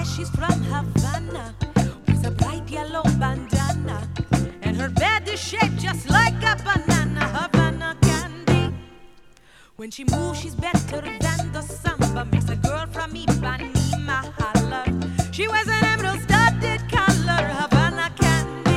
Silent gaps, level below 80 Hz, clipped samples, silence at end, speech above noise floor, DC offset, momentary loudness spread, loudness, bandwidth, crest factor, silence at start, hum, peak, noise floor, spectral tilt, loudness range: none; -34 dBFS; under 0.1%; 0 s; 27 dB; under 0.1%; 8 LU; -22 LUFS; 15 kHz; 20 dB; 0 s; none; -2 dBFS; -50 dBFS; -5 dB/octave; 5 LU